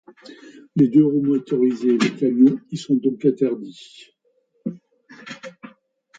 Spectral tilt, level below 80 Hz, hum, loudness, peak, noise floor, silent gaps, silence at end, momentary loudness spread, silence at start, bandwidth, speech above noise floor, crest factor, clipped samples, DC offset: -7 dB/octave; -68 dBFS; none; -19 LUFS; -4 dBFS; -66 dBFS; none; 0.5 s; 21 LU; 0.3 s; 8 kHz; 47 dB; 16 dB; under 0.1%; under 0.1%